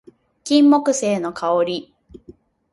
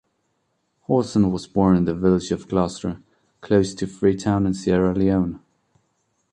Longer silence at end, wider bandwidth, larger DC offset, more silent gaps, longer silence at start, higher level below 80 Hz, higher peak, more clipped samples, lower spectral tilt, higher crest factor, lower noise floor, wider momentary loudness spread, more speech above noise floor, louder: about the same, 0.9 s vs 0.95 s; first, 11.5 kHz vs 9.6 kHz; neither; neither; second, 0.45 s vs 0.9 s; second, -60 dBFS vs -44 dBFS; about the same, -2 dBFS vs -4 dBFS; neither; second, -4.5 dB/octave vs -7.5 dB/octave; about the same, 18 dB vs 18 dB; second, -48 dBFS vs -71 dBFS; about the same, 12 LU vs 10 LU; second, 31 dB vs 51 dB; first, -18 LUFS vs -21 LUFS